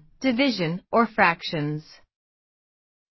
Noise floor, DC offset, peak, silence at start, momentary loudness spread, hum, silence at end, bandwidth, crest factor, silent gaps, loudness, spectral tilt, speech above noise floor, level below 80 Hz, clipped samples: under -90 dBFS; under 0.1%; -4 dBFS; 0.2 s; 10 LU; none; 1.3 s; 6.2 kHz; 22 dB; none; -23 LUFS; -6 dB/octave; over 67 dB; -62 dBFS; under 0.1%